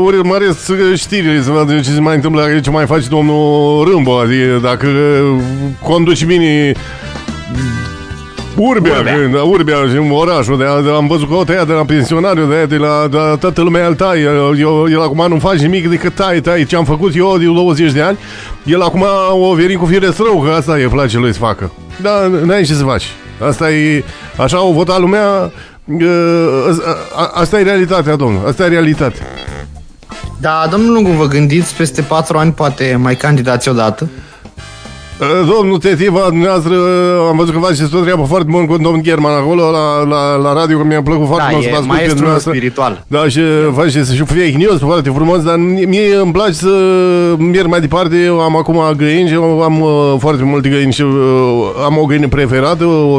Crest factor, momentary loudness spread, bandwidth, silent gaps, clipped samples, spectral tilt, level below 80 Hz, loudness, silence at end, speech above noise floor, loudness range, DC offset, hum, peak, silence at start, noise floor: 10 dB; 6 LU; 11 kHz; none; under 0.1%; -6.5 dB/octave; -32 dBFS; -10 LUFS; 0 s; 21 dB; 3 LU; under 0.1%; none; 0 dBFS; 0 s; -31 dBFS